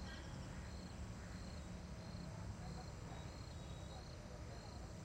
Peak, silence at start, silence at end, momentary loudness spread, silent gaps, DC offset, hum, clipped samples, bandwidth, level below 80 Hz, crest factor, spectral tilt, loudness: -38 dBFS; 0 s; 0 s; 2 LU; none; under 0.1%; none; under 0.1%; 16 kHz; -56 dBFS; 14 dB; -5.5 dB/octave; -52 LUFS